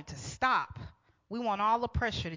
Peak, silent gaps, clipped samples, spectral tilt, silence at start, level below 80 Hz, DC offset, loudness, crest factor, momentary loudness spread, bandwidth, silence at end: -16 dBFS; none; under 0.1%; -4.5 dB/octave; 0 s; -48 dBFS; under 0.1%; -31 LUFS; 18 dB; 14 LU; 7.6 kHz; 0 s